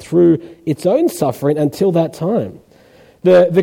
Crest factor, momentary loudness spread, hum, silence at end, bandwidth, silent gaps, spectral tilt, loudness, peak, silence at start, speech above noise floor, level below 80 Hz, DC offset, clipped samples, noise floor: 12 dB; 8 LU; none; 0 s; 16.5 kHz; none; -7.5 dB/octave; -15 LUFS; -2 dBFS; 0 s; 33 dB; -56 dBFS; under 0.1%; under 0.1%; -46 dBFS